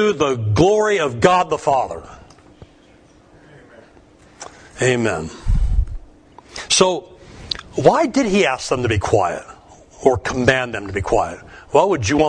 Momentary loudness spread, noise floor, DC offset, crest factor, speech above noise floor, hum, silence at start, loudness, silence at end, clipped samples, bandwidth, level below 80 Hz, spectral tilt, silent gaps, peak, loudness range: 16 LU; -49 dBFS; under 0.1%; 18 dB; 32 dB; none; 0 s; -18 LUFS; 0 s; under 0.1%; 10 kHz; -30 dBFS; -4.5 dB/octave; none; 0 dBFS; 8 LU